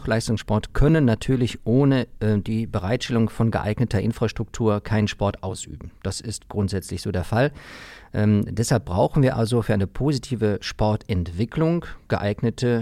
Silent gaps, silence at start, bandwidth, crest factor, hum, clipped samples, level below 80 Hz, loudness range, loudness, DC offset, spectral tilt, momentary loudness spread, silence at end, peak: none; 0 s; 14 kHz; 14 dB; none; under 0.1%; -36 dBFS; 4 LU; -23 LUFS; under 0.1%; -6.5 dB/octave; 10 LU; 0 s; -8 dBFS